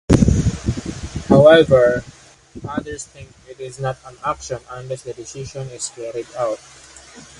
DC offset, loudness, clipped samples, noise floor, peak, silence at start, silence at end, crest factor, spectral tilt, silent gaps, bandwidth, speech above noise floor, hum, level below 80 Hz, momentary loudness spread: under 0.1%; -18 LUFS; under 0.1%; -42 dBFS; 0 dBFS; 0.1 s; 0.2 s; 18 dB; -6 dB/octave; none; 11.5 kHz; 22 dB; none; -32 dBFS; 20 LU